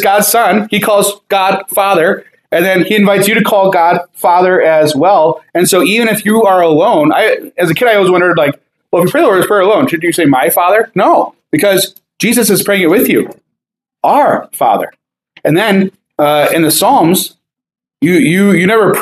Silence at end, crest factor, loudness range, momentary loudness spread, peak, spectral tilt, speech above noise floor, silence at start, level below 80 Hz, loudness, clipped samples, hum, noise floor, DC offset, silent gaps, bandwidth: 0 s; 10 dB; 3 LU; 6 LU; 0 dBFS; -4.5 dB/octave; 69 dB; 0 s; -58 dBFS; -10 LUFS; under 0.1%; none; -78 dBFS; under 0.1%; none; 15.5 kHz